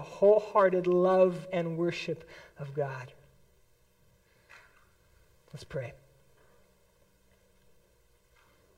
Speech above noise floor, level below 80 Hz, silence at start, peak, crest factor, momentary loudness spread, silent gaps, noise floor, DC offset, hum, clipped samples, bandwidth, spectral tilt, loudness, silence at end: 38 dB; -68 dBFS; 0 s; -12 dBFS; 20 dB; 23 LU; none; -67 dBFS; under 0.1%; none; under 0.1%; 11 kHz; -7.5 dB/octave; -28 LUFS; 2.85 s